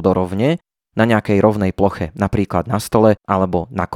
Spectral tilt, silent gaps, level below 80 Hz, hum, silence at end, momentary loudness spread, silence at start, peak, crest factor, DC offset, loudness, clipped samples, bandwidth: -7 dB/octave; none; -42 dBFS; none; 0 s; 6 LU; 0 s; 0 dBFS; 16 dB; under 0.1%; -17 LUFS; under 0.1%; 16.5 kHz